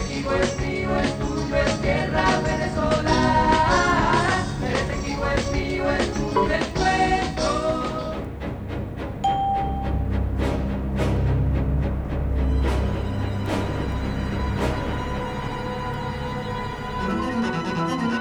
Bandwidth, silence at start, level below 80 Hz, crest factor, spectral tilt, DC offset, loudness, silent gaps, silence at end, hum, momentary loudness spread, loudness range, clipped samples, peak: 11 kHz; 0 s; -30 dBFS; 18 dB; -6 dB/octave; 0.2%; -24 LUFS; none; 0 s; none; 9 LU; 6 LU; under 0.1%; -6 dBFS